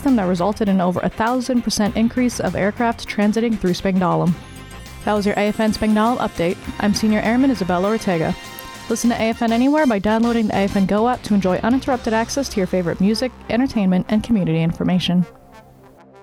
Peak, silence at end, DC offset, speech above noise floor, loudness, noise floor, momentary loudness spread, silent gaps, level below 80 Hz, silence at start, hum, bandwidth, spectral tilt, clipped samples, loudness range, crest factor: -8 dBFS; 0.6 s; under 0.1%; 28 dB; -19 LUFS; -46 dBFS; 5 LU; none; -42 dBFS; 0 s; none; 17.5 kHz; -6 dB/octave; under 0.1%; 2 LU; 10 dB